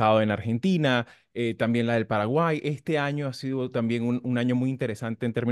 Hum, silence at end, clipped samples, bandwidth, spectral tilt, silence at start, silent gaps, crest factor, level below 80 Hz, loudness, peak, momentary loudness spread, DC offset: none; 0 s; under 0.1%; 12 kHz; -7 dB/octave; 0 s; none; 18 dB; -66 dBFS; -26 LUFS; -8 dBFS; 7 LU; under 0.1%